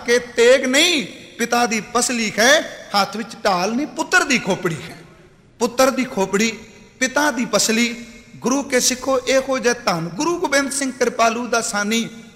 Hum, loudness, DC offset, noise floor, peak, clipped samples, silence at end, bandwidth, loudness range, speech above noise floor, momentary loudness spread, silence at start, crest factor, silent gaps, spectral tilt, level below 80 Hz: none; -18 LUFS; under 0.1%; -48 dBFS; -2 dBFS; under 0.1%; 0.05 s; 16 kHz; 3 LU; 29 dB; 9 LU; 0 s; 16 dB; none; -2.5 dB/octave; -54 dBFS